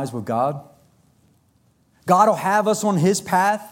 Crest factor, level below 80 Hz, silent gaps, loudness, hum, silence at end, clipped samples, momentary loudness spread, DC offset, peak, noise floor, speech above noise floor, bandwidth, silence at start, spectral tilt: 18 dB; -66 dBFS; none; -19 LUFS; none; 0 s; under 0.1%; 9 LU; under 0.1%; -2 dBFS; -61 dBFS; 42 dB; 17 kHz; 0 s; -5 dB/octave